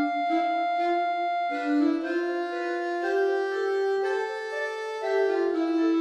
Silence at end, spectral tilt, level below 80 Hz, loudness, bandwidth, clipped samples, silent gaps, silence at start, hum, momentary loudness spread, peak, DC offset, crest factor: 0 s; -3 dB/octave; -80 dBFS; -27 LUFS; 10 kHz; under 0.1%; none; 0 s; none; 5 LU; -14 dBFS; under 0.1%; 12 dB